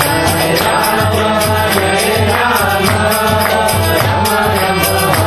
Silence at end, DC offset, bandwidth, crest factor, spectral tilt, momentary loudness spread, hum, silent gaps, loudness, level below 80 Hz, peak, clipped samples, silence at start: 0 s; under 0.1%; 13.5 kHz; 12 dB; -4 dB/octave; 1 LU; none; none; -12 LUFS; -34 dBFS; 0 dBFS; under 0.1%; 0 s